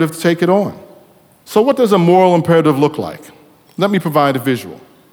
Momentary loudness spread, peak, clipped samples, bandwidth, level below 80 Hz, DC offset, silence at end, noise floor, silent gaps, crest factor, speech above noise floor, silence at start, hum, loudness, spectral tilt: 13 LU; 0 dBFS; under 0.1%; 19.5 kHz; -58 dBFS; under 0.1%; 0.35 s; -47 dBFS; none; 14 dB; 34 dB; 0 s; none; -14 LUFS; -6.5 dB/octave